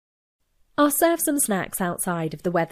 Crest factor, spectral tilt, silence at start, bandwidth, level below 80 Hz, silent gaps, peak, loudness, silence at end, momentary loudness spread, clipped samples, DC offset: 16 dB; -4 dB/octave; 0.8 s; 15.5 kHz; -56 dBFS; none; -8 dBFS; -23 LUFS; 0.05 s; 8 LU; under 0.1%; under 0.1%